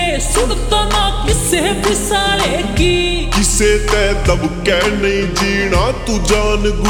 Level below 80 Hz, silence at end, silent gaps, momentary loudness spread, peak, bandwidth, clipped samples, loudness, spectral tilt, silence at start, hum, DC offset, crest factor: -20 dBFS; 0 s; none; 3 LU; 0 dBFS; 20 kHz; under 0.1%; -14 LUFS; -3.5 dB/octave; 0 s; none; under 0.1%; 12 dB